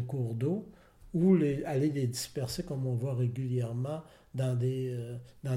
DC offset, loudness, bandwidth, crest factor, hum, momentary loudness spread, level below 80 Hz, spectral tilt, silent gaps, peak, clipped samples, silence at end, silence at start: under 0.1%; -32 LUFS; 16 kHz; 16 dB; none; 11 LU; -60 dBFS; -7 dB/octave; none; -14 dBFS; under 0.1%; 0 s; 0 s